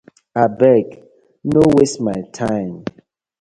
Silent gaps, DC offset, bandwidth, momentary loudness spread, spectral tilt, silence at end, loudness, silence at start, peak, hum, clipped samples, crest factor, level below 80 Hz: none; under 0.1%; 11.5 kHz; 17 LU; -6.5 dB/octave; 0.5 s; -16 LUFS; 0.35 s; 0 dBFS; none; under 0.1%; 16 dB; -48 dBFS